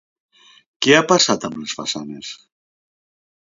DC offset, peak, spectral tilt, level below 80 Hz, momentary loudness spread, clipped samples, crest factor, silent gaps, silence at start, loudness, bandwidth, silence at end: under 0.1%; 0 dBFS; -3 dB/octave; -62 dBFS; 20 LU; under 0.1%; 22 dB; none; 0.8 s; -17 LUFS; 7.8 kHz; 1.05 s